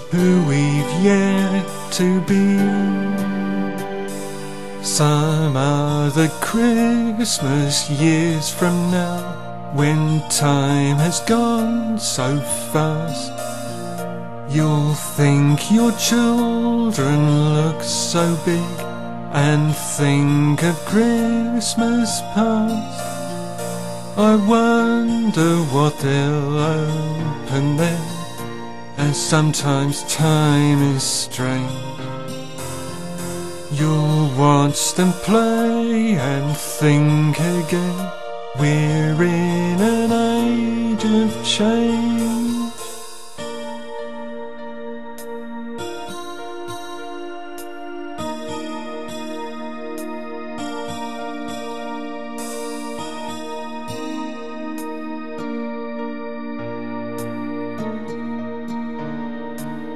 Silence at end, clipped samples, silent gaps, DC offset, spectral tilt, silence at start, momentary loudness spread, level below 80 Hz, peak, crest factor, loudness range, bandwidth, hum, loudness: 0 s; under 0.1%; none; 2%; -5.5 dB/octave; 0 s; 15 LU; -54 dBFS; -2 dBFS; 18 dB; 12 LU; 13.5 kHz; none; -19 LUFS